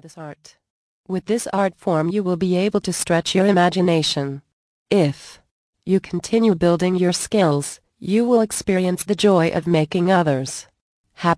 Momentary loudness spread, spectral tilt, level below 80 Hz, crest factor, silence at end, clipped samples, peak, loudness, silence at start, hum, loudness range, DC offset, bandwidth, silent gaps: 13 LU; -5.5 dB/octave; -54 dBFS; 16 dB; 0 s; under 0.1%; -2 dBFS; -19 LUFS; 0.05 s; none; 2 LU; under 0.1%; 11 kHz; 0.70-1.04 s, 4.53-4.86 s, 5.51-5.73 s, 10.81-11.04 s